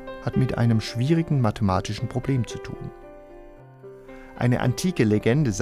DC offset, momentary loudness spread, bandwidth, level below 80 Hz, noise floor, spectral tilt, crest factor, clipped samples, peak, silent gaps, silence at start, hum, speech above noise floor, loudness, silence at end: under 0.1%; 22 LU; 14 kHz; -46 dBFS; -45 dBFS; -6.5 dB/octave; 16 dB; under 0.1%; -8 dBFS; none; 0 s; none; 22 dB; -24 LUFS; 0 s